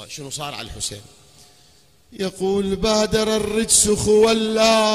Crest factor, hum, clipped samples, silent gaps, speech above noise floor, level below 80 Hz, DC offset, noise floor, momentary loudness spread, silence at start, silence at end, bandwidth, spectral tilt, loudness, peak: 18 dB; none; under 0.1%; none; 35 dB; -42 dBFS; 0.1%; -54 dBFS; 14 LU; 0 s; 0 s; 15.5 kHz; -3 dB/octave; -18 LUFS; -2 dBFS